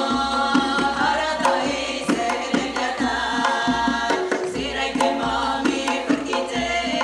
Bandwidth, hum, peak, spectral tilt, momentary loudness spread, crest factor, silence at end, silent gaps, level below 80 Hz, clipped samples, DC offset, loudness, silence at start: 12.5 kHz; none; -4 dBFS; -3 dB/octave; 4 LU; 18 dB; 0 s; none; -46 dBFS; under 0.1%; under 0.1%; -22 LUFS; 0 s